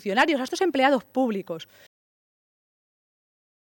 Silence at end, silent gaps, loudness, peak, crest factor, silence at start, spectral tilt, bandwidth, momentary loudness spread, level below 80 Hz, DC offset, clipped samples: 2 s; none; -23 LUFS; -6 dBFS; 20 dB; 0.05 s; -4 dB/octave; 17 kHz; 13 LU; -72 dBFS; under 0.1%; under 0.1%